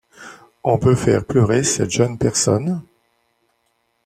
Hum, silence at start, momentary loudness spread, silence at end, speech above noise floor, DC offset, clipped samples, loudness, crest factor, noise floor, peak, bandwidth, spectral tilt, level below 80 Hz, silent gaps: none; 0.2 s; 8 LU; 1.25 s; 50 dB; under 0.1%; under 0.1%; -18 LUFS; 16 dB; -67 dBFS; -2 dBFS; 14.5 kHz; -5 dB/octave; -46 dBFS; none